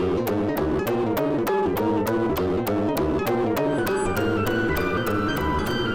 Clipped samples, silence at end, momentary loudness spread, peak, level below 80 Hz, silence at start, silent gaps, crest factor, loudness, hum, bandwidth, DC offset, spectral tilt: under 0.1%; 0 s; 1 LU; -12 dBFS; -40 dBFS; 0 s; none; 10 dB; -23 LUFS; none; 17 kHz; under 0.1%; -6 dB/octave